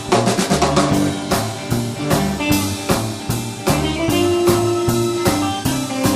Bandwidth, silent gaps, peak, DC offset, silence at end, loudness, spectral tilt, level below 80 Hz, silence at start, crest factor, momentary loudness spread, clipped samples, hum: 15.5 kHz; none; 0 dBFS; under 0.1%; 0 s; -18 LUFS; -5 dB/octave; -36 dBFS; 0 s; 18 dB; 6 LU; under 0.1%; none